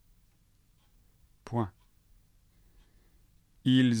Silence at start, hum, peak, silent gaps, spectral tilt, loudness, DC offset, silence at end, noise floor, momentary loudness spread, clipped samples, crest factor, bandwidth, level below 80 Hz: 1.45 s; none; -14 dBFS; none; -6.5 dB/octave; -30 LUFS; under 0.1%; 0 s; -66 dBFS; 16 LU; under 0.1%; 20 dB; 10 kHz; -64 dBFS